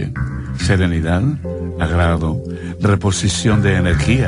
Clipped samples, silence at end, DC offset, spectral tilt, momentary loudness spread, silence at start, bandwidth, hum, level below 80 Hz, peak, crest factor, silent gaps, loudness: under 0.1%; 0 s; under 0.1%; -5.5 dB/octave; 9 LU; 0 s; 11 kHz; none; -28 dBFS; -2 dBFS; 14 dB; none; -17 LUFS